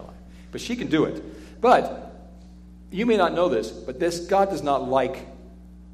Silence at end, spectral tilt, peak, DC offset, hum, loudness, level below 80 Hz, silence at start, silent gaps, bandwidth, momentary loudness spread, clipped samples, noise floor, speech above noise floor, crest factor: 0 s; -5.5 dB/octave; -6 dBFS; under 0.1%; none; -23 LUFS; -46 dBFS; 0 s; none; 15 kHz; 19 LU; under 0.1%; -45 dBFS; 22 dB; 18 dB